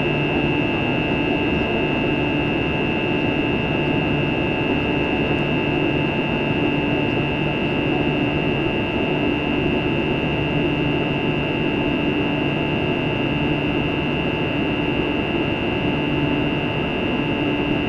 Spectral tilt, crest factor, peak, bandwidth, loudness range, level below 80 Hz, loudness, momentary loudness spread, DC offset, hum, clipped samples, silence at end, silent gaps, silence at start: -7.5 dB/octave; 12 dB; -8 dBFS; 7 kHz; 1 LU; -38 dBFS; -20 LUFS; 1 LU; under 0.1%; none; under 0.1%; 0 s; none; 0 s